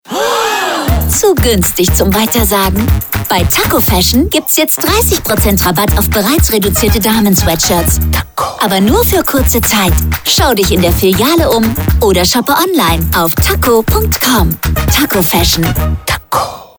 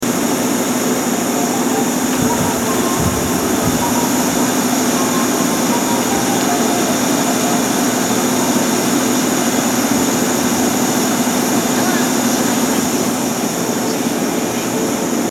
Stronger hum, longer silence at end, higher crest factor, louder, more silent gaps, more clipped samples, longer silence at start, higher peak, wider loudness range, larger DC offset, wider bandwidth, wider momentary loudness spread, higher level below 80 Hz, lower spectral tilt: neither; about the same, 0.1 s vs 0 s; about the same, 10 dB vs 14 dB; first, -10 LUFS vs -15 LUFS; neither; neither; about the same, 0.1 s vs 0 s; about the same, 0 dBFS vs -2 dBFS; about the same, 1 LU vs 1 LU; neither; first, over 20 kHz vs 17.5 kHz; about the same, 4 LU vs 3 LU; first, -20 dBFS vs -44 dBFS; about the same, -4 dB/octave vs -3.5 dB/octave